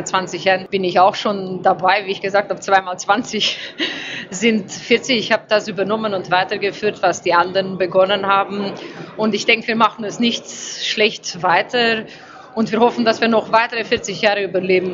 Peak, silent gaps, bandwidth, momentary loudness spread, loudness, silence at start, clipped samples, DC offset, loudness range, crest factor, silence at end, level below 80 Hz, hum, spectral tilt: 0 dBFS; none; 7.8 kHz; 8 LU; -17 LUFS; 0 s; under 0.1%; under 0.1%; 1 LU; 18 dB; 0 s; -60 dBFS; none; -3.5 dB/octave